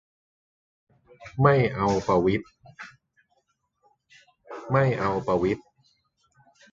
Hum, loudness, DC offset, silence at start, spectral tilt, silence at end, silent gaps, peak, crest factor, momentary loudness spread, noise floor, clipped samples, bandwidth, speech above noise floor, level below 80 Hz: none; -24 LUFS; under 0.1%; 1.2 s; -7.5 dB/octave; 1.1 s; none; -6 dBFS; 22 dB; 23 LU; -73 dBFS; under 0.1%; 7.6 kHz; 49 dB; -52 dBFS